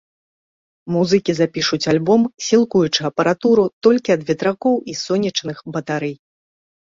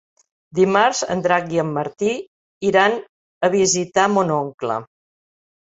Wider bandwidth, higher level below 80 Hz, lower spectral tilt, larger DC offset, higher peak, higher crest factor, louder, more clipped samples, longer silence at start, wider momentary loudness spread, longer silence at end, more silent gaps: about the same, 7.6 kHz vs 8.2 kHz; about the same, -58 dBFS vs -60 dBFS; about the same, -5 dB/octave vs -4 dB/octave; neither; about the same, -2 dBFS vs -2 dBFS; about the same, 16 dB vs 18 dB; about the same, -18 LUFS vs -19 LUFS; neither; first, 0.85 s vs 0.55 s; about the same, 9 LU vs 10 LU; second, 0.7 s vs 0.85 s; second, 3.73-3.81 s vs 2.27-2.61 s, 3.09-3.41 s, 4.54-4.58 s